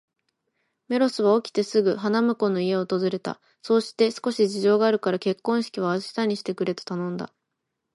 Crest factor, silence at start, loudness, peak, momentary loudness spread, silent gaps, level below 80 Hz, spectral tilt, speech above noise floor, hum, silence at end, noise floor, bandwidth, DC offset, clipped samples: 16 dB; 0.9 s; -24 LUFS; -8 dBFS; 9 LU; none; -74 dBFS; -6 dB/octave; 57 dB; none; 0.7 s; -81 dBFS; 11.5 kHz; under 0.1%; under 0.1%